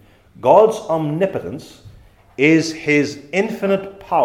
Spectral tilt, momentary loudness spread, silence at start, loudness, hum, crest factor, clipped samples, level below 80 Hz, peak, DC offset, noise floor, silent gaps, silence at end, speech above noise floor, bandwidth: -6 dB/octave; 14 LU; 0.45 s; -17 LUFS; none; 18 dB; under 0.1%; -54 dBFS; 0 dBFS; under 0.1%; -44 dBFS; none; 0 s; 28 dB; 14.5 kHz